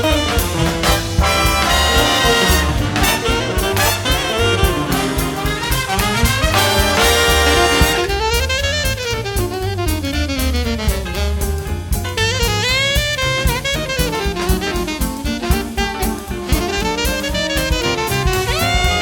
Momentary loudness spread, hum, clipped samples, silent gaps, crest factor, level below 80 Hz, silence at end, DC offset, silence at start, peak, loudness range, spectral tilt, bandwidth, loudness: 8 LU; none; under 0.1%; none; 16 dB; -22 dBFS; 0 s; under 0.1%; 0 s; 0 dBFS; 5 LU; -3.5 dB/octave; 19.5 kHz; -16 LUFS